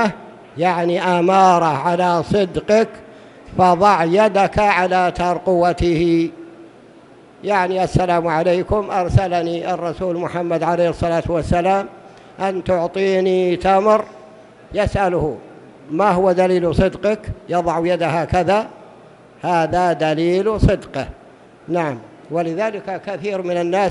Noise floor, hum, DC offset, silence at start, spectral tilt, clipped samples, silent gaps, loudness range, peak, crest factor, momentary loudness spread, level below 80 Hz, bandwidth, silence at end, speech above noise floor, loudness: -44 dBFS; none; under 0.1%; 0 s; -6.5 dB/octave; under 0.1%; none; 4 LU; 0 dBFS; 18 dB; 11 LU; -36 dBFS; 11.5 kHz; 0 s; 28 dB; -18 LUFS